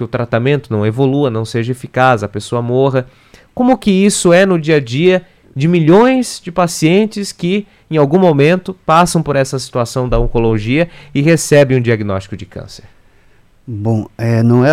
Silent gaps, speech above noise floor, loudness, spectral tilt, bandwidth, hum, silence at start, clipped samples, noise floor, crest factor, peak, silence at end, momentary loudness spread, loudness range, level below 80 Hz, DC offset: none; 34 dB; -13 LUFS; -6 dB/octave; 15 kHz; none; 0 s; under 0.1%; -47 dBFS; 12 dB; 0 dBFS; 0 s; 10 LU; 4 LU; -32 dBFS; under 0.1%